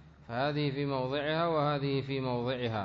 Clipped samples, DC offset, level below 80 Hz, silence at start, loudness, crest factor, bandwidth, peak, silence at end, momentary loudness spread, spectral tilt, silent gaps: under 0.1%; under 0.1%; -60 dBFS; 0 s; -32 LUFS; 14 dB; 6.2 kHz; -18 dBFS; 0 s; 4 LU; -5 dB/octave; none